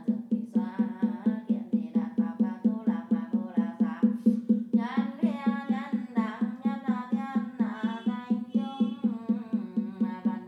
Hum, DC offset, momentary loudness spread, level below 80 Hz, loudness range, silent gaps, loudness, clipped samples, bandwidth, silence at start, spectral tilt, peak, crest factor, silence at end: none; under 0.1%; 5 LU; under -90 dBFS; 3 LU; none; -29 LUFS; under 0.1%; 4.6 kHz; 0 s; -9 dB/octave; -12 dBFS; 16 dB; 0 s